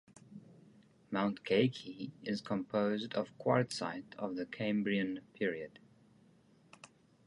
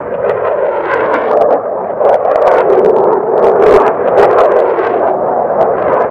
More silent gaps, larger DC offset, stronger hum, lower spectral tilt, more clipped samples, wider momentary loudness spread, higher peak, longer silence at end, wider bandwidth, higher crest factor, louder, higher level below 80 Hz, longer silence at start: neither; neither; neither; about the same, -6 dB/octave vs -7 dB/octave; second, under 0.1% vs 1%; first, 24 LU vs 6 LU; second, -16 dBFS vs 0 dBFS; first, 0.4 s vs 0 s; first, 11.5 kHz vs 8 kHz; first, 22 dB vs 10 dB; second, -36 LUFS vs -10 LUFS; second, -76 dBFS vs -44 dBFS; first, 0.3 s vs 0 s